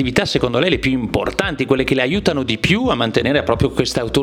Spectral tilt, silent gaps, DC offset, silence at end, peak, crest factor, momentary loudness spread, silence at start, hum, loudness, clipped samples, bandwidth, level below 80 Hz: -5.5 dB/octave; none; 0.1%; 0 s; 0 dBFS; 16 dB; 3 LU; 0 s; none; -17 LUFS; under 0.1%; 16.5 kHz; -36 dBFS